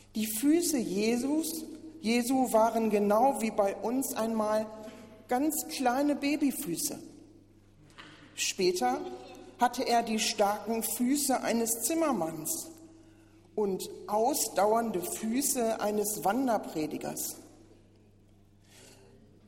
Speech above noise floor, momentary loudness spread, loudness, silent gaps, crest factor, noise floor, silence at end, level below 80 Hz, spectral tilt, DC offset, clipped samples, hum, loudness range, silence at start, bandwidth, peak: 31 dB; 10 LU; -30 LUFS; none; 18 dB; -60 dBFS; 0.55 s; -64 dBFS; -3.5 dB/octave; under 0.1%; under 0.1%; none; 4 LU; 0.15 s; 16.5 kHz; -12 dBFS